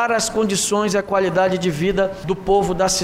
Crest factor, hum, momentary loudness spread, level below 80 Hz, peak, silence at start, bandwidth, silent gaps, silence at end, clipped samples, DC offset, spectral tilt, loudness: 12 dB; none; 3 LU; -40 dBFS; -6 dBFS; 0 s; 16 kHz; none; 0 s; under 0.1%; under 0.1%; -4 dB/octave; -19 LUFS